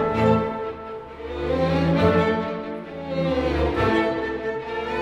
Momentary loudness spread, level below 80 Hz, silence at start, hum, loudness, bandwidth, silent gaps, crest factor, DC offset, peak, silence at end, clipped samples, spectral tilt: 14 LU; -38 dBFS; 0 s; none; -23 LUFS; 9.6 kHz; none; 16 dB; under 0.1%; -6 dBFS; 0 s; under 0.1%; -7.5 dB/octave